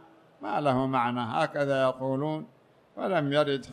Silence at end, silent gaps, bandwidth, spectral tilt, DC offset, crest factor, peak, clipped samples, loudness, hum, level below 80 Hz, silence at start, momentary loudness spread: 0 s; none; 11 kHz; -7 dB/octave; under 0.1%; 16 dB; -12 dBFS; under 0.1%; -28 LUFS; none; -64 dBFS; 0.4 s; 10 LU